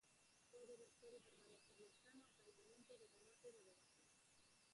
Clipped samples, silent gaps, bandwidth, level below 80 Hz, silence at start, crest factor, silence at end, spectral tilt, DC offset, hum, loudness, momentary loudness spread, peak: under 0.1%; none; 11.5 kHz; under -90 dBFS; 0 s; 16 dB; 0 s; -2.5 dB/octave; under 0.1%; none; -67 LUFS; 5 LU; -52 dBFS